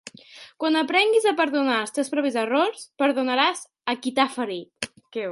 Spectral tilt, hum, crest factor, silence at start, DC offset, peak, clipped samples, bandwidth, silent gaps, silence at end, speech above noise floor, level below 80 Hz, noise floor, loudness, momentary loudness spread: -2.5 dB/octave; none; 18 dB; 0.05 s; under 0.1%; -4 dBFS; under 0.1%; 11.5 kHz; none; 0 s; 25 dB; -72 dBFS; -47 dBFS; -23 LUFS; 12 LU